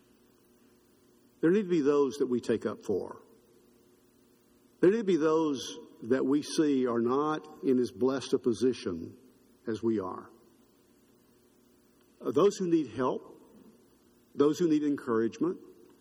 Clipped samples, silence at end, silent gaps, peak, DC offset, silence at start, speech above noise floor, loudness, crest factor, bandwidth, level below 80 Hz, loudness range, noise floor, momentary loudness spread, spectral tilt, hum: under 0.1%; 0.35 s; none; -12 dBFS; under 0.1%; 1.4 s; 35 dB; -29 LUFS; 18 dB; 14.5 kHz; -72 dBFS; 5 LU; -64 dBFS; 14 LU; -6 dB/octave; none